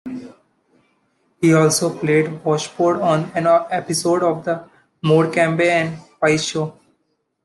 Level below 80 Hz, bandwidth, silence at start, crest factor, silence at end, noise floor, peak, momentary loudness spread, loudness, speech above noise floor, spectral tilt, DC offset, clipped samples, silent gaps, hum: -62 dBFS; 12.5 kHz; 0.05 s; 16 dB; 0.75 s; -69 dBFS; -2 dBFS; 11 LU; -18 LUFS; 52 dB; -5 dB/octave; under 0.1%; under 0.1%; none; none